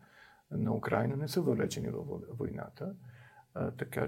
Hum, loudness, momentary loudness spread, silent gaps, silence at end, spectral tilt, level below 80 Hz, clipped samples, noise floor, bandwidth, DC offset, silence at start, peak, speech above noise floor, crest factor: none; -36 LUFS; 12 LU; none; 0 s; -6.5 dB/octave; -64 dBFS; under 0.1%; -61 dBFS; 16.5 kHz; under 0.1%; 0.15 s; -14 dBFS; 26 dB; 22 dB